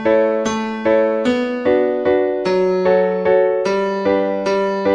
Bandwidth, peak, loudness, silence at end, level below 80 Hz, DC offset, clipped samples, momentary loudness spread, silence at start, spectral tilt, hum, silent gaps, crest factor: 9.8 kHz; -2 dBFS; -17 LUFS; 0 s; -52 dBFS; under 0.1%; under 0.1%; 3 LU; 0 s; -6 dB/octave; none; none; 14 dB